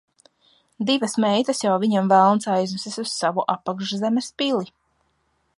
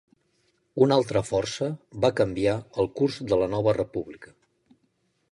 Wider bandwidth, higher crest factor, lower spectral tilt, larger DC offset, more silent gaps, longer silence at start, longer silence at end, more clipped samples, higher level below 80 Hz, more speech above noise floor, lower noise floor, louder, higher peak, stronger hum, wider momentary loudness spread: about the same, 11.5 kHz vs 11.5 kHz; about the same, 18 dB vs 20 dB; second, -4.5 dB/octave vs -6 dB/octave; neither; neither; about the same, 0.8 s vs 0.75 s; about the same, 0.95 s vs 1.05 s; neither; second, -72 dBFS vs -54 dBFS; about the same, 47 dB vs 46 dB; about the same, -68 dBFS vs -71 dBFS; first, -21 LUFS vs -25 LUFS; first, -4 dBFS vs -8 dBFS; neither; about the same, 11 LU vs 10 LU